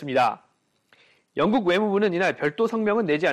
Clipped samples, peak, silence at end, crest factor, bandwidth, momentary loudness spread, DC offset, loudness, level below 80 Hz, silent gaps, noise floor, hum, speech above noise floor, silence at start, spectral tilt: under 0.1%; -10 dBFS; 0 s; 14 dB; 12 kHz; 4 LU; under 0.1%; -23 LUFS; -64 dBFS; none; -63 dBFS; none; 41 dB; 0 s; -6 dB/octave